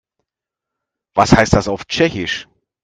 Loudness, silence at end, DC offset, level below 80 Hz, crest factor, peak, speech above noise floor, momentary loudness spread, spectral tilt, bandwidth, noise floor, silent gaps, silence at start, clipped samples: -16 LUFS; 0.4 s; under 0.1%; -34 dBFS; 18 dB; 0 dBFS; 70 dB; 11 LU; -5 dB/octave; 10 kHz; -84 dBFS; none; 1.15 s; under 0.1%